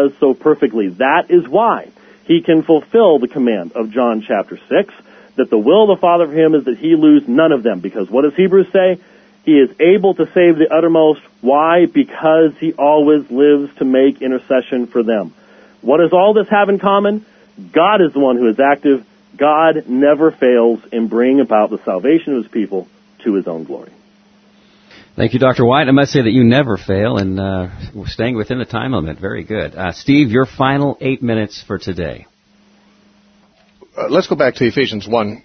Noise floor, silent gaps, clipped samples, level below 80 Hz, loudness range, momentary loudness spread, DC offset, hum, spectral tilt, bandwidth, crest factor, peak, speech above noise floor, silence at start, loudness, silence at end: -52 dBFS; none; under 0.1%; -48 dBFS; 7 LU; 11 LU; under 0.1%; none; -7.5 dB/octave; 6.4 kHz; 14 dB; 0 dBFS; 39 dB; 0 s; -13 LUFS; 0.05 s